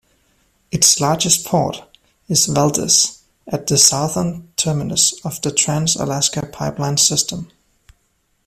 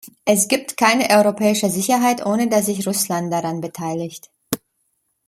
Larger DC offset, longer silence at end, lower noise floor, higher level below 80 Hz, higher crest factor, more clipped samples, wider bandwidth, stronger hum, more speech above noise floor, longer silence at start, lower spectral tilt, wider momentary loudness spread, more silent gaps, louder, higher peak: neither; first, 1 s vs 0.7 s; second, -64 dBFS vs -69 dBFS; first, -50 dBFS vs -62 dBFS; about the same, 18 dB vs 20 dB; neither; about the same, 16 kHz vs 16.5 kHz; neither; second, 47 dB vs 51 dB; first, 0.75 s vs 0.05 s; about the same, -3 dB/octave vs -3.5 dB/octave; about the same, 12 LU vs 13 LU; neither; first, -15 LUFS vs -18 LUFS; about the same, 0 dBFS vs 0 dBFS